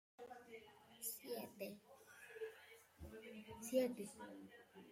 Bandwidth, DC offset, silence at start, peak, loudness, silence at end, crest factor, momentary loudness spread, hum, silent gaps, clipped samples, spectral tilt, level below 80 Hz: 16.5 kHz; under 0.1%; 0.2 s; -28 dBFS; -49 LUFS; 0 s; 22 dB; 20 LU; none; none; under 0.1%; -4 dB/octave; -76 dBFS